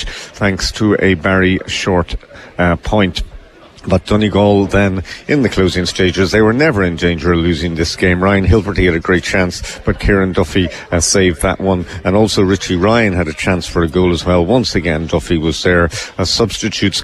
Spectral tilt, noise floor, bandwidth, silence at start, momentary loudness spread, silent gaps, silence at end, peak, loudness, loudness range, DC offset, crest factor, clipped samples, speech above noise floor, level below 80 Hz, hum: -5 dB/octave; -37 dBFS; 13 kHz; 0 s; 6 LU; none; 0 s; -2 dBFS; -14 LUFS; 2 LU; under 0.1%; 12 dB; under 0.1%; 24 dB; -30 dBFS; none